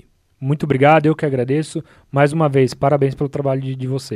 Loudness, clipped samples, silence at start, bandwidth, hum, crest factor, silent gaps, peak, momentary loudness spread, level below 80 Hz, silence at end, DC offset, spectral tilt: -17 LUFS; under 0.1%; 0.4 s; 11.5 kHz; none; 18 dB; none; 0 dBFS; 11 LU; -52 dBFS; 0 s; under 0.1%; -7.5 dB/octave